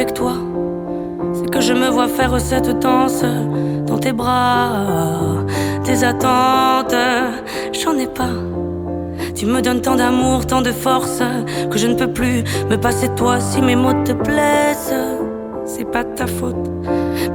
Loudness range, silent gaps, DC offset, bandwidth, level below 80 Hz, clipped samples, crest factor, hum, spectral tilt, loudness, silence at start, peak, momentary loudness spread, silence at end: 2 LU; none; under 0.1%; 19 kHz; -36 dBFS; under 0.1%; 14 dB; none; -5 dB/octave; -17 LUFS; 0 s; -2 dBFS; 8 LU; 0 s